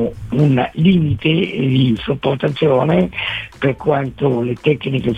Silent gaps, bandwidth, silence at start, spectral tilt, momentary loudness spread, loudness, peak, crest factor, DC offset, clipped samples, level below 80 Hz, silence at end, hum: none; 8.2 kHz; 0 s; -8.5 dB/octave; 5 LU; -16 LUFS; -2 dBFS; 14 dB; 0.1%; under 0.1%; -42 dBFS; 0 s; none